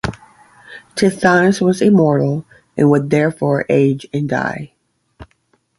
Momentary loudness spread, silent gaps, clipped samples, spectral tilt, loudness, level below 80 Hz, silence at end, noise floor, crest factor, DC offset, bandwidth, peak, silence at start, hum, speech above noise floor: 14 LU; none; under 0.1%; -7 dB/octave; -15 LUFS; -46 dBFS; 0.55 s; -61 dBFS; 16 dB; under 0.1%; 11.5 kHz; 0 dBFS; 0.05 s; none; 47 dB